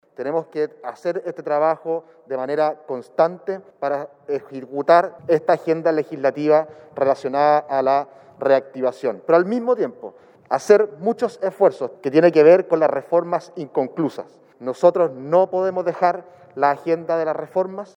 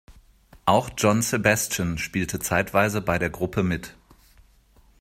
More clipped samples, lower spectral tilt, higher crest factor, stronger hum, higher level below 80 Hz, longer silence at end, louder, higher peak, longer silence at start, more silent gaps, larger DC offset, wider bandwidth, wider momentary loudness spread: neither; first, -7 dB/octave vs -4.5 dB/octave; about the same, 20 dB vs 22 dB; neither; second, -78 dBFS vs -48 dBFS; second, 0.1 s vs 1.1 s; first, -20 LUFS vs -23 LUFS; about the same, 0 dBFS vs -2 dBFS; about the same, 0.2 s vs 0.1 s; neither; neither; second, 10 kHz vs 16 kHz; first, 12 LU vs 6 LU